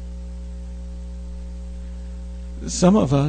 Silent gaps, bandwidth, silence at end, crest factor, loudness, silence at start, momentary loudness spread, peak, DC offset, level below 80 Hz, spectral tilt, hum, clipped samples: none; 9.4 kHz; 0 s; 20 dB; -25 LUFS; 0 s; 18 LU; -4 dBFS; under 0.1%; -32 dBFS; -6.5 dB/octave; 60 Hz at -30 dBFS; under 0.1%